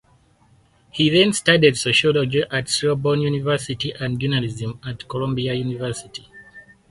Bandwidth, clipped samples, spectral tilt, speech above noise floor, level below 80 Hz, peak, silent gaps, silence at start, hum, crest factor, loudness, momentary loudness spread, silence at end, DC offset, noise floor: 11.5 kHz; under 0.1%; -4.5 dB/octave; 37 dB; -52 dBFS; 0 dBFS; none; 0.95 s; none; 20 dB; -20 LUFS; 14 LU; 0.3 s; under 0.1%; -57 dBFS